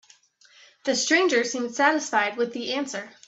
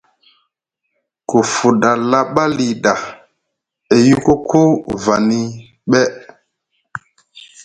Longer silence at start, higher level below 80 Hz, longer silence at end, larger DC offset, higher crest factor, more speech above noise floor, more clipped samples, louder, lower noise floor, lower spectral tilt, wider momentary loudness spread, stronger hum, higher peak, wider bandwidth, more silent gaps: second, 0.85 s vs 1.3 s; second, -76 dBFS vs -50 dBFS; first, 0.2 s vs 0 s; neither; about the same, 20 dB vs 16 dB; second, 33 dB vs 61 dB; neither; second, -24 LUFS vs -14 LUFS; second, -57 dBFS vs -75 dBFS; second, -1.5 dB/octave vs -5.5 dB/octave; second, 9 LU vs 19 LU; neither; second, -6 dBFS vs 0 dBFS; second, 8.4 kHz vs 10.5 kHz; neither